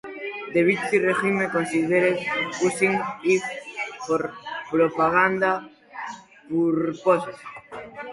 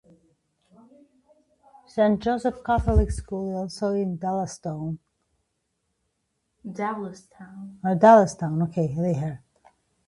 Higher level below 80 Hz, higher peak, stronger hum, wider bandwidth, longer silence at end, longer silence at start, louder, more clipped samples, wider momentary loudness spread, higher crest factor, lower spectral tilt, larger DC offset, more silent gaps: second, -64 dBFS vs -38 dBFS; about the same, -6 dBFS vs -4 dBFS; neither; about the same, 11.5 kHz vs 11.5 kHz; second, 0 s vs 0.7 s; second, 0.05 s vs 1.95 s; about the same, -23 LUFS vs -24 LUFS; neither; second, 16 LU vs 22 LU; about the same, 18 dB vs 22 dB; second, -5.5 dB/octave vs -7.5 dB/octave; neither; neither